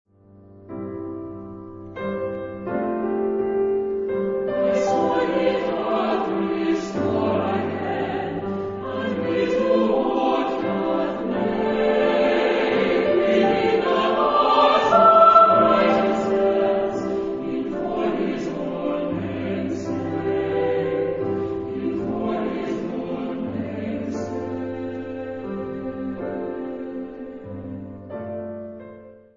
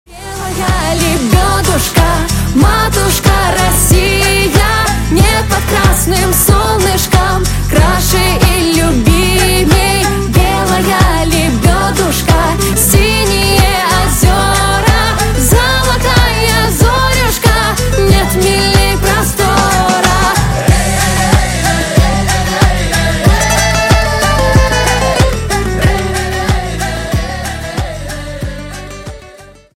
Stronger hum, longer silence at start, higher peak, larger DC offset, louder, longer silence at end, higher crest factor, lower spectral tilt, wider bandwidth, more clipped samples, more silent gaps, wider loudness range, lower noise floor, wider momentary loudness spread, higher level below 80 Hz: neither; first, 0.5 s vs 0.1 s; about the same, -2 dBFS vs 0 dBFS; neither; second, -22 LUFS vs -10 LUFS; about the same, 0.2 s vs 0.3 s; first, 20 dB vs 10 dB; first, -6.5 dB/octave vs -4 dB/octave; second, 7.6 kHz vs 17 kHz; neither; neither; first, 13 LU vs 2 LU; first, -49 dBFS vs -36 dBFS; first, 15 LU vs 6 LU; second, -54 dBFS vs -16 dBFS